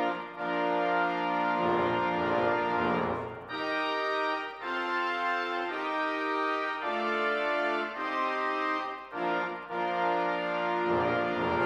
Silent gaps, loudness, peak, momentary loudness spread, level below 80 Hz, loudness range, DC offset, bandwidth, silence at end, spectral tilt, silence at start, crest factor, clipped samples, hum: none; -30 LUFS; -14 dBFS; 6 LU; -68 dBFS; 2 LU; under 0.1%; 10.5 kHz; 0 s; -6 dB/octave; 0 s; 14 dB; under 0.1%; none